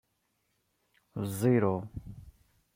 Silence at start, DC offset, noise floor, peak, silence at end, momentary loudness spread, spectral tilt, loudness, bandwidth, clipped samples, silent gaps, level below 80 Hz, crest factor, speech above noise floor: 1.15 s; under 0.1%; -77 dBFS; -14 dBFS; 0.45 s; 19 LU; -7.5 dB/octave; -30 LUFS; 16.5 kHz; under 0.1%; none; -60 dBFS; 20 dB; 48 dB